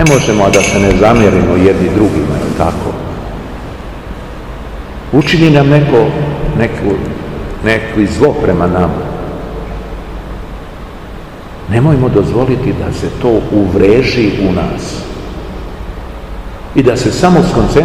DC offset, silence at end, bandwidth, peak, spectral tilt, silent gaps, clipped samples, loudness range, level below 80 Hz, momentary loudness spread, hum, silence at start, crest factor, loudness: 0.9%; 0 s; 15 kHz; 0 dBFS; -6.5 dB/octave; none; 1%; 6 LU; -26 dBFS; 18 LU; none; 0 s; 12 dB; -11 LUFS